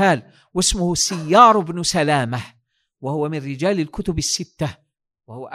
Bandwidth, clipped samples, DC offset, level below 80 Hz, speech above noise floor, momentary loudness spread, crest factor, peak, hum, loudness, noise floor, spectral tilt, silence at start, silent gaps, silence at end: 16 kHz; under 0.1%; under 0.1%; -40 dBFS; 37 dB; 16 LU; 20 dB; 0 dBFS; none; -19 LUFS; -56 dBFS; -4 dB/octave; 0 s; none; 0 s